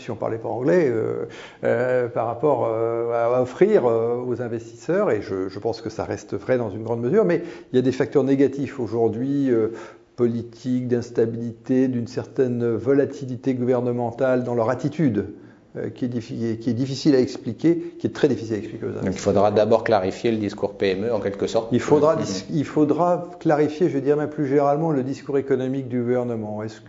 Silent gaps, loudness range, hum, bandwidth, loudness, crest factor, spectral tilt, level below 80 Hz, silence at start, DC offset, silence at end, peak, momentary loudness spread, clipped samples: none; 3 LU; none; 7.8 kHz; -22 LUFS; 20 dB; -7 dB/octave; -60 dBFS; 0 s; under 0.1%; 0 s; -2 dBFS; 9 LU; under 0.1%